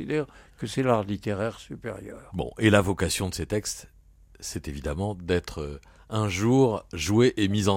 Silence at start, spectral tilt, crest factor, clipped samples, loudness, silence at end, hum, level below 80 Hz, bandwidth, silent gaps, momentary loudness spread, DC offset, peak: 0 s; -5.5 dB/octave; 22 dB; under 0.1%; -26 LUFS; 0 s; none; -46 dBFS; 16.5 kHz; none; 16 LU; under 0.1%; -4 dBFS